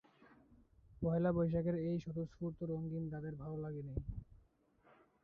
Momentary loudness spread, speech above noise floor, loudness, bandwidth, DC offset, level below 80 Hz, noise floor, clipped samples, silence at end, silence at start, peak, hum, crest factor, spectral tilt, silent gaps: 11 LU; 33 dB; -40 LUFS; 6.2 kHz; under 0.1%; -58 dBFS; -72 dBFS; under 0.1%; 0.9 s; 0.2 s; -26 dBFS; none; 16 dB; -10 dB/octave; none